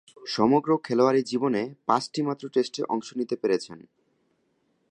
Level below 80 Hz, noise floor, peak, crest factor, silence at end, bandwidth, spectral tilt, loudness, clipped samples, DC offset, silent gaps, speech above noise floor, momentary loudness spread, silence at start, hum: -72 dBFS; -71 dBFS; -6 dBFS; 20 dB; 1.15 s; 10.5 kHz; -5.5 dB/octave; -26 LUFS; under 0.1%; under 0.1%; none; 46 dB; 8 LU; 0.2 s; none